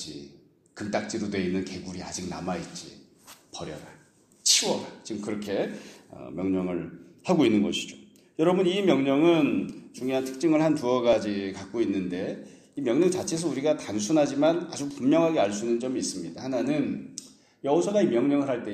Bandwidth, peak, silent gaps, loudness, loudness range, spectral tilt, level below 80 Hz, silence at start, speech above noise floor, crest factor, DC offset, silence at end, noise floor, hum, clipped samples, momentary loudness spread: 14 kHz; -8 dBFS; none; -26 LUFS; 6 LU; -4.5 dB/octave; -64 dBFS; 0 s; 30 dB; 20 dB; under 0.1%; 0 s; -56 dBFS; none; under 0.1%; 17 LU